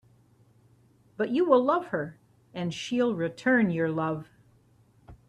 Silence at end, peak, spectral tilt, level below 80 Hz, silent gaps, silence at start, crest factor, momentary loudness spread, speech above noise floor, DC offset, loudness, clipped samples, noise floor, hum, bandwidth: 0.15 s; -8 dBFS; -6.5 dB/octave; -66 dBFS; none; 1.2 s; 20 dB; 13 LU; 35 dB; under 0.1%; -27 LUFS; under 0.1%; -62 dBFS; none; 10 kHz